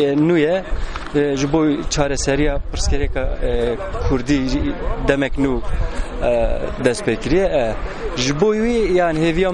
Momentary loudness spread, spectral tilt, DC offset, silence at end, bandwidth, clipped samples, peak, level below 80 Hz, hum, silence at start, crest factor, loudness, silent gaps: 7 LU; -5.5 dB/octave; under 0.1%; 0 s; 11 kHz; under 0.1%; 0 dBFS; -24 dBFS; none; 0 s; 16 dB; -19 LUFS; none